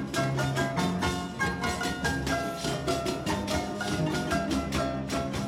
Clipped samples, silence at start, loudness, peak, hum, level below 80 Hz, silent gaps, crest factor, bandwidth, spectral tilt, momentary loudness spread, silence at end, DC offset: under 0.1%; 0 s; -29 LUFS; -14 dBFS; none; -44 dBFS; none; 14 dB; 16.5 kHz; -5 dB/octave; 3 LU; 0 s; under 0.1%